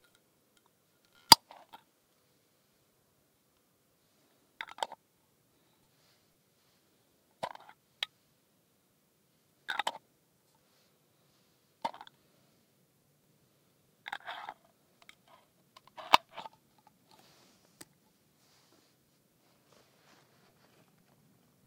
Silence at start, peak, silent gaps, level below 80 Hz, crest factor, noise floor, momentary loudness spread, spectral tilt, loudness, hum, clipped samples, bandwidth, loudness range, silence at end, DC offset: 1.3 s; 0 dBFS; none; -76 dBFS; 40 dB; -72 dBFS; 35 LU; -0.5 dB/octave; -30 LUFS; none; under 0.1%; 16 kHz; 21 LU; 5.25 s; under 0.1%